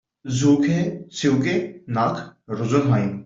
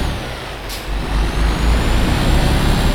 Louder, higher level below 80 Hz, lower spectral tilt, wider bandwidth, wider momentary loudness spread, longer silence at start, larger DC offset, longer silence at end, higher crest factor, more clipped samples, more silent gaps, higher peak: about the same, -21 LUFS vs -19 LUFS; second, -56 dBFS vs -18 dBFS; about the same, -6.5 dB/octave vs -5.5 dB/octave; second, 7.8 kHz vs 17 kHz; about the same, 10 LU vs 10 LU; first, 0.25 s vs 0 s; neither; about the same, 0.05 s vs 0 s; about the same, 16 dB vs 12 dB; neither; neither; second, -6 dBFS vs -2 dBFS